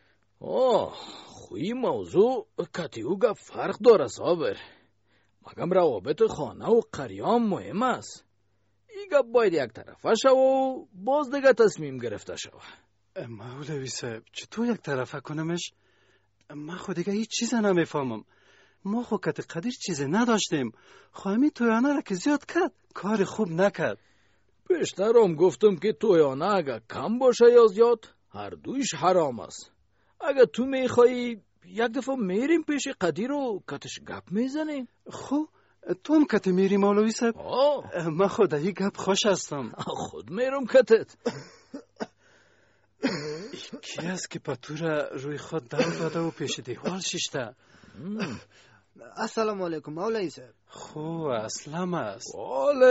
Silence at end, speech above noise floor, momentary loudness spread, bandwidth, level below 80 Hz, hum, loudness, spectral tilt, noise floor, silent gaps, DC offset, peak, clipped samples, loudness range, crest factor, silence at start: 0 s; 46 dB; 17 LU; 8 kHz; -68 dBFS; none; -26 LUFS; -4.5 dB/octave; -72 dBFS; none; under 0.1%; -6 dBFS; under 0.1%; 10 LU; 20 dB; 0.4 s